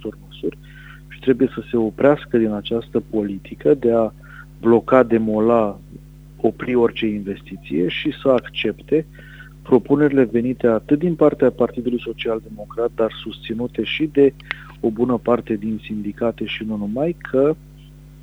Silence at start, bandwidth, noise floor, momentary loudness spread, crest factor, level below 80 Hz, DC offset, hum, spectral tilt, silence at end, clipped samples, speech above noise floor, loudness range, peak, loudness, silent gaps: 0 s; 8.8 kHz; -42 dBFS; 13 LU; 18 dB; -46 dBFS; under 0.1%; none; -8 dB/octave; 0 s; under 0.1%; 23 dB; 3 LU; 0 dBFS; -20 LUFS; none